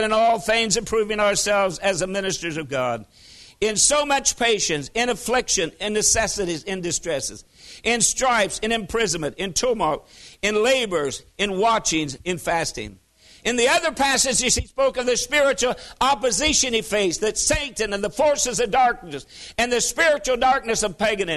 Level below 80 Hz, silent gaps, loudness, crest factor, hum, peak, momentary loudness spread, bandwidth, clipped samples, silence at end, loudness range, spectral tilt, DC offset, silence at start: -44 dBFS; none; -21 LUFS; 18 dB; none; -4 dBFS; 9 LU; 12.5 kHz; under 0.1%; 0 s; 3 LU; -2 dB/octave; under 0.1%; 0 s